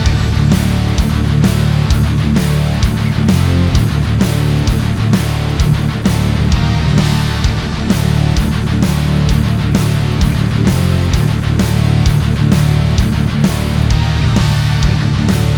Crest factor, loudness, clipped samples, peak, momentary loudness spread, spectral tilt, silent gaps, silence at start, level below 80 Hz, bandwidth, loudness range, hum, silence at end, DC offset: 12 dB; -13 LUFS; under 0.1%; 0 dBFS; 2 LU; -6 dB/octave; none; 0 s; -20 dBFS; 19.5 kHz; 1 LU; none; 0 s; under 0.1%